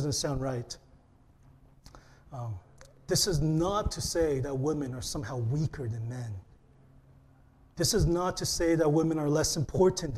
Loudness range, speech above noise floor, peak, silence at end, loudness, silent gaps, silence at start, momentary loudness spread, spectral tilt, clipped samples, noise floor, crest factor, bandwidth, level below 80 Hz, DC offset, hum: 6 LU; 31 dB; -12 dBFS; 0 s; -29 LUFS; none; 0 s; 15 LU; -5 dB/octave; under 0.1%; -60 dBFS; 18 dB; 15 kHz; -46 dBFS; under 0.1%; none